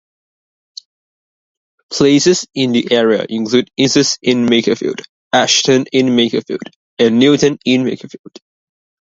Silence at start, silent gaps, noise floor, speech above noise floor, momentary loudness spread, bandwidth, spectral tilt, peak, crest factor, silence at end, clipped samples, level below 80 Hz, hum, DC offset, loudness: 1.9 s; 5.09-5.31 s, 6.76-6.97 s; under -90 dBFS; over 77 dB; 13 LU; 7.8 kHz; -4 dB/octave; 0 dBFS; 14 dB; 1.1 s; under 0.1%; -56 dBFS; none; under 0.1%; -13 LUFS